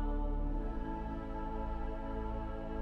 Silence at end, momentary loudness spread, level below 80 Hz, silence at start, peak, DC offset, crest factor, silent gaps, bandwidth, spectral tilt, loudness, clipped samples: 0 s; 3 LU; -38 dBFS; 0 s; -26 dBFS; under 0.1%; 12 dB; none; 4.2 kHz; -9 dB/octave; -41 LUFS; under 0.1%